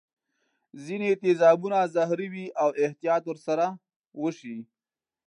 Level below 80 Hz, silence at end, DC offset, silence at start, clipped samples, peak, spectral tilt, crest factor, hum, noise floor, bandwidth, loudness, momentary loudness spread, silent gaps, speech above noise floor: -84 dBFS; 0.65 s; under 0.1%; 0.75 s; under 0.1%; -8 dBFS; -6.5 dB/octave; 20 dB; none; under -90 dBFS; 10.5 kHz; -26 LUFS; 20 LU; 3.96-4.04 s; over 65 dB